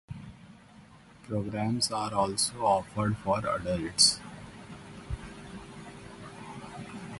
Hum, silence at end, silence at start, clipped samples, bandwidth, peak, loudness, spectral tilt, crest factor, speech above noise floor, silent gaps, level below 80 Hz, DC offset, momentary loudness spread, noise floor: none; 0 s; 0.1 s; under 0.1%; 12 kHz; -8 dBFS; -28 LUFS; -3.5 dB/octave; 24 dB; 25 dB; none; -52 dBFS; under 0.1%; 24 LU; -54 dBFS